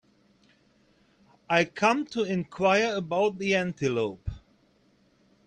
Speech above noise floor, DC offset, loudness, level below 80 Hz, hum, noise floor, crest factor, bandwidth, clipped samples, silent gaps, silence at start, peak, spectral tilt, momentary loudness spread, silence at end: 39 dB; under 0.1%; -26 LUFS; -54 dBFS; none; -64 dBFS; 20 dB; 9.6 kHz; under 0.1%; none; 1.5 s; -8 dBFS; -5 dB/octave; 7 LU; 1.1 s